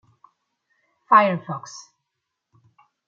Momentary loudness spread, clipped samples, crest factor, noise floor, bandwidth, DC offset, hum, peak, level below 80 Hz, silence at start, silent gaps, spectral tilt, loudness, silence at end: 24 LU; under 0.1%; 24 dB; -81 dBFS; 7.6 kHz; under 0.1%; none; -2 dBFS; -78 dBFS; 1.1 s; none; -5.5 dB/octave; -19 LUFS; 1.25 s